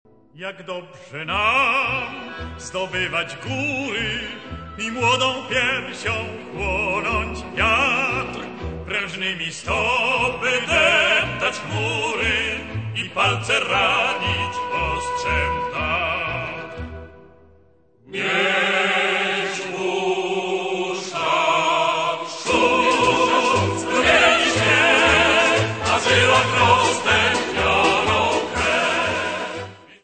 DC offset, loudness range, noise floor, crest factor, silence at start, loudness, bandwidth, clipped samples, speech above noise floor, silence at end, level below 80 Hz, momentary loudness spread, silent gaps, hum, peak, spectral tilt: 0.2%; 7 LU; -56 dBFS; 18 dB; 0.35 s; -19 LUFS; 9.2 kHz; under 0.1%; 34 dB; 0.1 s; -42 dBFS; 15 LU; none; none; -2 dBFS; -3.5 dB/octave